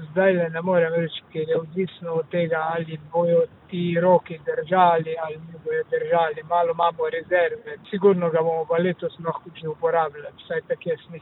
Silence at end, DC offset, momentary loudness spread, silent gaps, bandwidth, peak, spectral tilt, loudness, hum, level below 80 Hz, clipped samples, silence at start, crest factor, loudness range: 0 s; under 0.1%; 11 LU; none; 4.1 kHz; -4 dBFS; -10.5 dB/octave; -23 LUFS; none; -66 dBFS; under 0.1%; 0 s; 18 dB; 2 LU